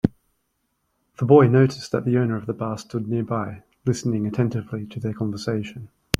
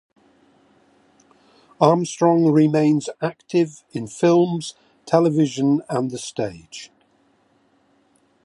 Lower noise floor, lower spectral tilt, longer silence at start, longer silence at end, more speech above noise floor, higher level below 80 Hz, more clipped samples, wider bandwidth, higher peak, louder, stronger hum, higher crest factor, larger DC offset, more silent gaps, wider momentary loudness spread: first, -73 dBFS vs -61 dBFS; about the same, -7 dB/octave vs -6.5 dB/octave; second, 0.05 s vs 1.8 s; second, 0.05 s vs 1.6 s; first, 51 dB vs 42 dB; first, -50 dBFS vs -66 dBFS; neither; first, 15 kHz vs 11.5 kHz; about the same, 0 dBFS vs 0 dBFS; about the same, -22 LUFS vs -20 LUFS; neither; about the same, 22 dB vs 20 dB; neither; neither; about the same, 14 LU vs 15 LU